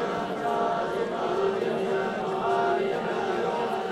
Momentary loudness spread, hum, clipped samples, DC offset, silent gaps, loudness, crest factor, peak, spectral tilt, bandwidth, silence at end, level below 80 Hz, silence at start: 3 LU; none; under 0.1%; under 0.1%; none; -27 LUFS; 14 dB; -14 dBFS; -5.5 dB/octave; 12.5 kHz; 0 s; -62 dBFS; 0 s